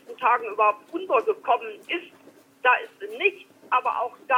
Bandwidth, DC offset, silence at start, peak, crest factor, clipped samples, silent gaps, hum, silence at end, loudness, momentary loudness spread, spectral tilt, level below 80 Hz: 15.5 kHz; under 0.1%; 0.1 s; -8 dBFS; 18 dB; under 0.1%; none; none; 0 s; -24 LUFS; 9 LU; -3 dB/octave; -80 dBFS